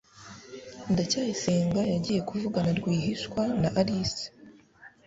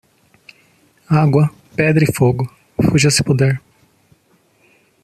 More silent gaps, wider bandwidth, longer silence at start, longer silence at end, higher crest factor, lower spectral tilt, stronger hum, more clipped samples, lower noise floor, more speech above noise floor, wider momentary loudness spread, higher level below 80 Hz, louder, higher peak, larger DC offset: neither; second, 8 kHz vs 14 kHz; second, 0.15 s vs 1.1 s; second, 0.2 s vs 1.45 s; about the same, 18 dB vs 16 dB; about the same, -5.5 dB/octave vs -5.5 dB/octave; neither; neither; about the same, -54 dBFS vs -57 dBFS; second, 27 dB vs 43 dB; first, 18 LU vs 7 LU; second, -56 dBFS vs -46 dBFS; second, -28 LUFS vs -15 LUFS; second, -10 dBFS vs -2 dBFS; neither